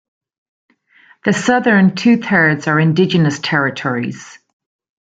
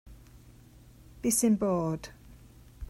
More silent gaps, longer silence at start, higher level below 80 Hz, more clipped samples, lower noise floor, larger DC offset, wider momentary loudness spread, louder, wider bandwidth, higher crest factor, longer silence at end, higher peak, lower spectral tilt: neither; first, 1.25 s vs 0.05 s; second, -58 dBFS vs -52 dBFS; neither; second, -50 dBFS vs -54 dBFS; neither; second, 10 LU vs 13 LU; first, -14 LUFS vs -28 LUFS; second, 9 kHz vs 16 kHz; about the same, 16 dB vs 18 dB; first, 0.75 s vs 0 s; first, 0 dBFS vs -14 dBFS; about the same, -6 dB/octave vs -5 dB/octave